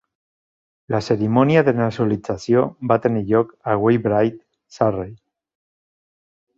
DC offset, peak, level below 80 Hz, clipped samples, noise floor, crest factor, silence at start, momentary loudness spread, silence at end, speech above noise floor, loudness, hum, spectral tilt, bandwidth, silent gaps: under 0.1%; -2 dBFS; -52 dBFS; under 0.1%; under -90 dBFS; 18 dB; 0.9 s; 9 LU; 1.45 s; over 72 dB; -19 LUFS; none; -8 dB/octave; 7.8 kHz; none